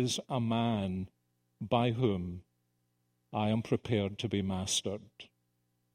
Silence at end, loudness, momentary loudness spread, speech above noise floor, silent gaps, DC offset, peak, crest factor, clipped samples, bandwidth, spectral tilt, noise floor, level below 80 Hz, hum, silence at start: 0.7 s; -33 LUFS; 13 LU; 45 dB; none; under 0.1%; -14 dBFS; 20 dB; under 0.1%; 15.5 kHz; -5 dB/octave; -78 dBFS; -64 dBFS; 60 Hz at -55 dBFS; 0 s